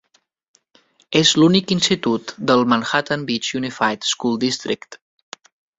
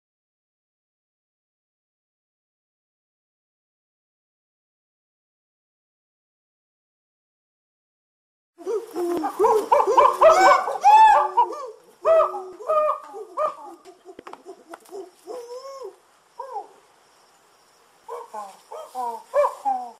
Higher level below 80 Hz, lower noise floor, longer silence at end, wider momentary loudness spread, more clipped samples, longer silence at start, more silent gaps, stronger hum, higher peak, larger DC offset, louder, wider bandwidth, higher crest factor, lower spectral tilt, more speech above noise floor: first, -58 dBFS vs -66 dBFS; about the same, -58 dBFS vs -57 dBFS; first, 0.8 s vs 0.1 s; second, 8 LU vs 25 LU; neither; second, 1.1 s vs 8.6 s; neither; neither; about the same, -2 dBFS vs -4 dBFS; neither; about the same, -18 LUFS vs -19 LUFS; second, 8.4 kHz vs 15.5 kHz; about the same, 18 dB vs 20 dB; first, -4 dB/octave vs -2.5 dB/octave; about the same, 39 dB vs 38 dB